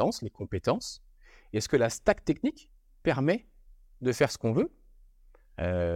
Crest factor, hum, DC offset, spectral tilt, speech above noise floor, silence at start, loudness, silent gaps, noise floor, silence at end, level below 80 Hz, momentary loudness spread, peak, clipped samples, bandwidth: 20 dB; none; under 0.1%; -5.5 dB/octave; 29 dB; 0 s; -30 LUFS; none; -58 dBFS; 0 s; -52 dBFS; 9 LU; -10 dBFS; under 0.1%; 16.5 kHz